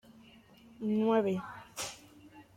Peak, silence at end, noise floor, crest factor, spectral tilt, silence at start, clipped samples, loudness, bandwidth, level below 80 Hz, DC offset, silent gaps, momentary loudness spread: -18 dBFS; 0.15 s; -58 dBFS; 18 dB; -5.5 dB/octave; 0.8 s; under 0.1%; -33 LUFS; 16.5 kHz; -70 dBFS; under 0.1%; none; 15 LU